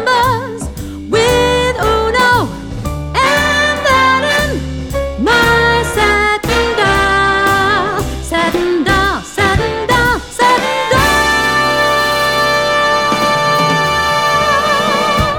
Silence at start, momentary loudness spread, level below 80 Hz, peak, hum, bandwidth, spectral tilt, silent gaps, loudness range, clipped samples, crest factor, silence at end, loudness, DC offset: 0 s; 7 LU; -28 dBFS; 0 dBFS; none; over 20 kHz; -4 dB/octave; none; 2 LU; under 0.1%; 12 dB; 0 s; -12 LUFS; under 0.1%